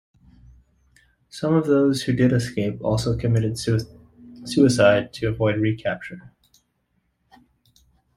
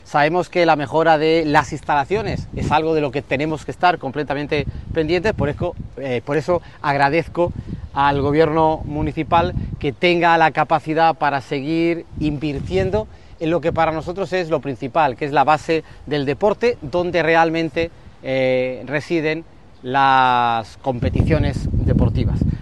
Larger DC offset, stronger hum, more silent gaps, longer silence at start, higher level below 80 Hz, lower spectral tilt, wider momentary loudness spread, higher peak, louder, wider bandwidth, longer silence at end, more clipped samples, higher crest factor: second, under 0.1% vs 0.5%; neither; neither; first, 1.35 s vs 0.1 s; second, -48 dBFS vs -34 dBFS; about the same, -6.5 dB/octave vs -7 dB/octave; first, 16 LU vs 9 LU; second, -4 dBFS vs 0 dBFS; about the same, -21 LUFS vs -19 LUFS; first, 14.5 kHz vs 11.5 kHz; first, 1.9 s vs 0 s; neither; about the same, 20 dB vs 18 dB